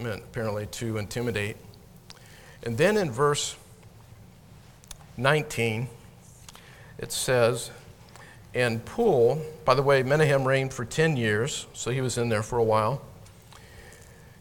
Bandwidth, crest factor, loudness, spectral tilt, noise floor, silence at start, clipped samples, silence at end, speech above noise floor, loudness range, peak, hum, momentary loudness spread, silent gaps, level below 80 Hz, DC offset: 18 kHz; 24 dB; -26 LUFS; -5 dB/octave; -51 dBFS; 0 s; under 0.1%; 0.45 s; 26 dB; 6 LU; -4 dBFS; none; 20 LU; none; -54 dBFS; under 0.1%